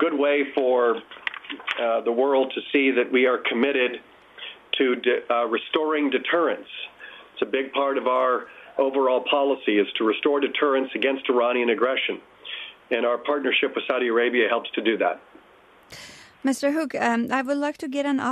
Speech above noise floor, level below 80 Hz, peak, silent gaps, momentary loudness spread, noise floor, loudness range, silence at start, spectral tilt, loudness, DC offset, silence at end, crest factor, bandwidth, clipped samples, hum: 31 dB; -72 dBFS; -8 dBFS; none; 13 LU; -53 dBFS; 3 LU; 0 s; -4 dB/octave; -23 LUFS; under 0.1%; 0 s; 16 dB; 13 kHz; under 0.1%; none